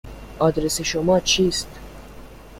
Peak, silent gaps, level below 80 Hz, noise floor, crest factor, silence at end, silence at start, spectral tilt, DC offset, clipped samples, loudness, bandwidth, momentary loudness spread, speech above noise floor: -6 dBFS; none; -40 dBFS; -40 dBFS; 18 dB; 0 s; 0.05 s; -3.5 dB/octave; under 0.1%; under 0.1%; -20 LUFS; 16.5 kHz; 23 LU; 20 dB